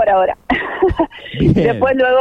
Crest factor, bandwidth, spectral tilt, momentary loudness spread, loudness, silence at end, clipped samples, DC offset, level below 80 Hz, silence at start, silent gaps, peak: 14 dB; 7.4 kHz; -8.5 dB/octave; 6 LU; -15 LUFS; 0 s; under 0.1%; under 0.1%; -32 dBFS; 0 s; none; 0 dBFS